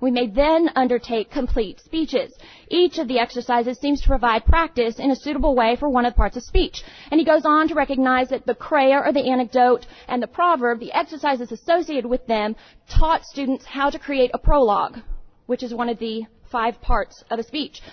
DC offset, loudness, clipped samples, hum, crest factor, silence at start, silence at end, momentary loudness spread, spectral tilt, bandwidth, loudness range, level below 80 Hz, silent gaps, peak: under 0.1%; -21 LUFS; under 0.1%; none; 16 dB; 0 s; 0 s; 10 LU; -6 dB/octave; 6.6 kHz; 4 LU; -30 dBFS; none; -4 dBFS